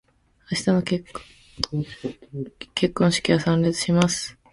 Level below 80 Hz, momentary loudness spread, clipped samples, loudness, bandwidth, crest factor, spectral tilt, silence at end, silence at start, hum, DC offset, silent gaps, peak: -52 dBFS; 15 LU; under 0.1%; -23 LUFS; 11.5 kHz; 22 dB; -5 dB/octave; 0.2 s; 0.5 s; none; under 0.1%; none; -2 dBFS